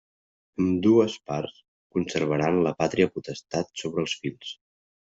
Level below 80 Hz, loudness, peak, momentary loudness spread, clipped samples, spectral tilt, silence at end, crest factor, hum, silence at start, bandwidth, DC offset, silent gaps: -62 dBFS; -26 LUFS; -8 dBFS; 17 LU; under 0.1%; -6 dB/octave; 0.5 s; 20 dB; none; 0.6 s; 8 kHz; under 0.1%; 1.68-1.90 s